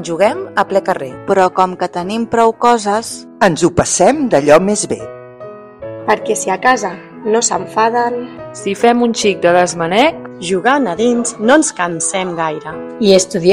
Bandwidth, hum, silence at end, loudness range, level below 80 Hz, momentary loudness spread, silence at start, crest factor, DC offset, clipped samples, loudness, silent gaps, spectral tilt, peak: 14 kHz; none; 0 s; 3 LU; -48 dBFS; 13 LU; 0 s; 14 dB; under 0.1%; 0.5%; -14 LUFS; none; -4 dB/octave; 0 dBFS